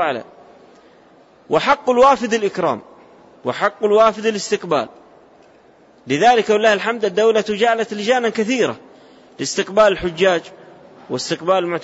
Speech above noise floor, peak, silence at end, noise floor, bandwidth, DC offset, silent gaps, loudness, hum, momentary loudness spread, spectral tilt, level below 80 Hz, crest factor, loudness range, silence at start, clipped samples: 33 dB; -4 dBFS; 0 s; -49 dBFS; 8 kHz; under 0.1%; none; -17 LUFS; none; 11 LU; -4 dB/octave; -54 dBFS; 16 dB; 3 LU; 0 s; under 0.1%